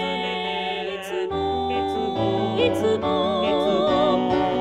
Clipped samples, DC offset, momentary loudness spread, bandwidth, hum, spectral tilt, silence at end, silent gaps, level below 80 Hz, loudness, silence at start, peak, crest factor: under 0.1%; 0.1%; 7 LU; 14.5 kHz; none; -6 dB/octave; 0 s; none; -48 dBFS; -23 LUFS; 0 s; -8 dBFS; 14 dB